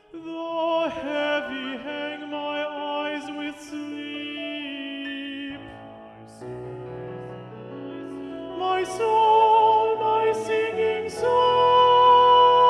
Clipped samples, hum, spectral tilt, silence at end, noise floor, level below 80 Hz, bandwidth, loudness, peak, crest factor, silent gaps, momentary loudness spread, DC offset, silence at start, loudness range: under 0.1%; none; -4.5 dB/octave; 0 s; -44 dBFS; -62 dBFS; 11.5 kHz; -22 LUFS; -8 dBFS; 16 dB; none; 20 LU; under 0.1%; 0.15 s; 16 LU